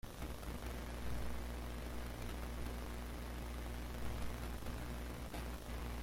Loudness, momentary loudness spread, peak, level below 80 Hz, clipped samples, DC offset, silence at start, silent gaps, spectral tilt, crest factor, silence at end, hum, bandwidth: -47 LUFS; 2 LU; -30 dBFS; -46 dBFS; under 0.1%; under 0.1%; 0.05 s; none; -5 dB/octave; 14 dB; 0 s; 60 Hz at -45 dBFS; 16.5 kHz